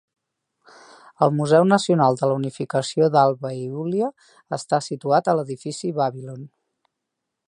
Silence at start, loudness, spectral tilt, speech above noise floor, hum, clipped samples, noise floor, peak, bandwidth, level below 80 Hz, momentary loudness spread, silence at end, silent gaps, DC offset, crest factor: 1.2 s; -21 LUFS; -6 dB/octave; 60 dB; none; under 0.1%; -81 dBFS; -2 dBFS; 11 kHz; -70 dBFS; 13 LU; 1 s; none; under 0.1%; 20 dB